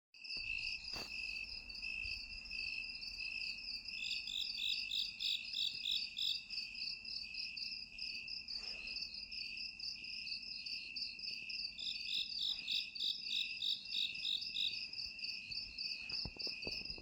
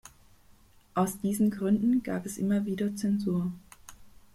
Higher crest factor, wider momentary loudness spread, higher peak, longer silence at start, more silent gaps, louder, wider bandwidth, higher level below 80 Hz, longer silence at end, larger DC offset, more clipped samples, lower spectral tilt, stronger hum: about the same, 18 dB vs 16 dB; about the same, 7 LU vs 9 LU; second, -26 dBFS vs -14 dBFS; second, 0.15 s vs 0.95 s; neither; second, -40 LUFS vs -29 LUFS; first, 19 kHz vs 15.5 kHz; second, -66 dBFS vs -60 dBFS; second, 0 s vs 0.25 s; neither; neither; second, -0.5 dB/octave vs -7 dB/octave; neither